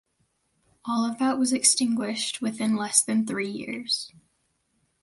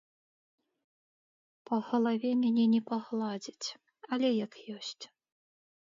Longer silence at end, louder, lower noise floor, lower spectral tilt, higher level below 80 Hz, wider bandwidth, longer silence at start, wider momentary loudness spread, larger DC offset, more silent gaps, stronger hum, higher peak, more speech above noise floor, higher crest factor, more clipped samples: about the same, 0.95 s vs 0.85 s; first, -24 LUFS vs -32 LUFS; second, -72 dBFS vs under -90 dBFS; second, -2 dB/octave vs -5.5 dB/octave; first, -70 dBFS vs -86 dBFS; first, 12 kHz vs 7.6 kHz; second, 0.85 s vs 1.7 s; second, 11 LU vs 14 LU; neither; neither; neither; first, -4 dBFS vs -18 dBFS; second, 47 dB vs over 59 dB; first, 22 dB vs 14 dB; neither